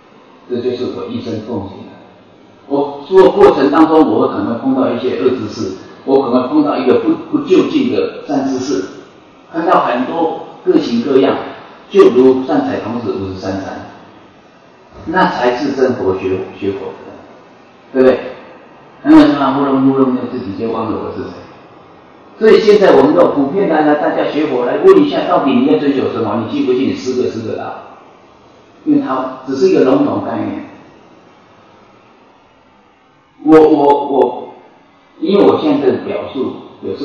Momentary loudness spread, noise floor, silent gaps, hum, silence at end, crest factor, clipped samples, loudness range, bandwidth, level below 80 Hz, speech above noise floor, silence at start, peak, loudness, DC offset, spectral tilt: 16 LU; -49 dBFS; none; none; 0 s; 14 dB; 0.8%; 6 LU; 7.2 kHz; -52 dBFS; 37 dB; 0.5 s; 0 dBFS; -13 LUFS; under 0.1%; -7 dB/octave